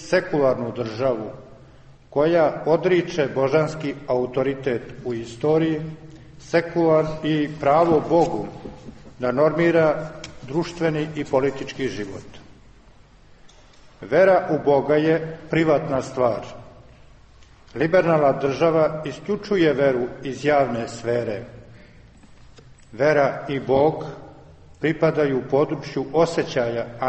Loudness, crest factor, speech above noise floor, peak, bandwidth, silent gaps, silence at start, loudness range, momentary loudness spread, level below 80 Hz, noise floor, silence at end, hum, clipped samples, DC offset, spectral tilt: -21 LUFS; 16 dB; 29 dB; -6 dBFS; 8.4 kHz; none; 0 s; 4 LU; 12 LU; -52 dBFS; -50 dBFS; 0 s; none; under 0.1%; under 0.1%; -7 dB/octave